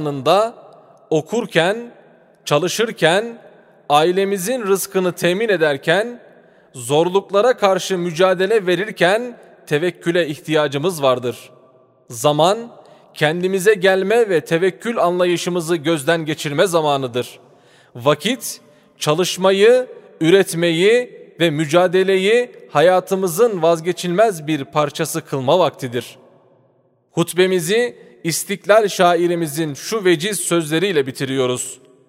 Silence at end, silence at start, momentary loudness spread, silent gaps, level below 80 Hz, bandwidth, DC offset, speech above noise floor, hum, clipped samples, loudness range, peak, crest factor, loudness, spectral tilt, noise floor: 0.35 s; 0 s; 9 LU; none; -68 dBFS; 16 kHz; under 0.1%; 42 dB; none; under 0.1%; 4 LU; 0 dBFS; 18 dB; -17 LUFS; -4.5 dB/octave; -58 dBFS